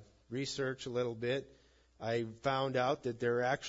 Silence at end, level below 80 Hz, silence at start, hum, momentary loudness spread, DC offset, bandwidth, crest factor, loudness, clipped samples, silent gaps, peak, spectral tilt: 0 s; -68 dBFS; 0 s; none; 7 LU; under 0.1%; 7.6 kHz; 16 dB; -36 LUFS; under 0.1%; none; -20 dBFS; -4 dB/octave